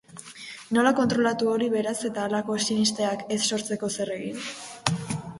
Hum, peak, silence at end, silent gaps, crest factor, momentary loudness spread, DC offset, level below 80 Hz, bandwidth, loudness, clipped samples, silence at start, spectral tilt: none; -4 dBFS; 0 s; none; 22 dB; 12 LU; under 0.1%; -62 dBFS; 11.5 kHz; -26 LUFS; under 0.1%; 0.1 s; -4 dB/octave